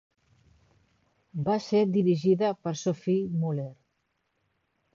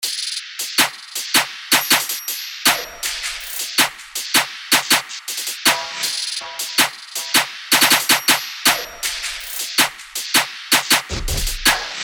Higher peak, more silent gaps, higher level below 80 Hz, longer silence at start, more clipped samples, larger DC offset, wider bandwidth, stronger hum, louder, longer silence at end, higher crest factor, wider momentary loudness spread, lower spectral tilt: second, -14 dBFS vs 0 dBFS; neither; second, -68 dBFS vs -38 dBFS; first, 1.35 s vs 0 s; neither; neither; second, 7.4 kHz vs over 20 kHz; neither; second, -27 LUFS vs -17 LUFS; first, 1.2 s vs 0 s; about the same, 16 dB vs 20 dB; about the same, 10 LU vs 10 LU; first, -7.5 dB/octave vs 0 dB/octave